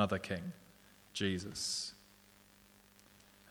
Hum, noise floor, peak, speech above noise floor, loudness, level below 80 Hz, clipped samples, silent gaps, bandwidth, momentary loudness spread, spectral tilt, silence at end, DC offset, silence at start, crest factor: 50 Hz at -65 dBFS; -64 dBFS; -16 dBFS; 26 dB; -39 LUFS; -70 dBFS; under 0.1%; none; over 20 kHz; 24 LU; -4 dB/octave; 0 s; under 0.1%; 0 s; 26 dB